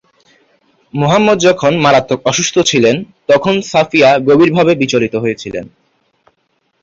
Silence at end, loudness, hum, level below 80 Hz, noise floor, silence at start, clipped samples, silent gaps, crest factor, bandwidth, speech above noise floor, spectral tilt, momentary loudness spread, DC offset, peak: 1.15 s; -11 LUFS; none; -50 dBFS; -62 dBFS; 0.95 s; under 0.1%; none; 12 dB; 7.8 kHz; 51 dB; -4.5 dB/octave; 10 LU; under 0.1%; 0 dBFS